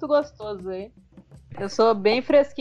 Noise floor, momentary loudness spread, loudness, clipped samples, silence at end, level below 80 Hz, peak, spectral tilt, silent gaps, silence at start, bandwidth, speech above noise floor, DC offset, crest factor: -45 dBFS; 17 LU; -22 LUFS; under 0.1%; 0.1 s; -56 dBFS; -8 dBFS; -5.5 dB/octave; none; 0 s; 7.8 kHz; 23 dB; under 0.1%; 16 dB